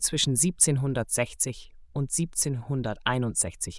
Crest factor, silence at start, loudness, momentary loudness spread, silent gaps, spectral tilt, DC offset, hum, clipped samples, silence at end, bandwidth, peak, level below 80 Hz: 22 dB; 0 s; -26 LUFS; 9 LU; none; -3.5 dB/octave; under 0.1%; none; under 0.1%; 0 s; 12 kHz; -6 dBFS; -50 dBFS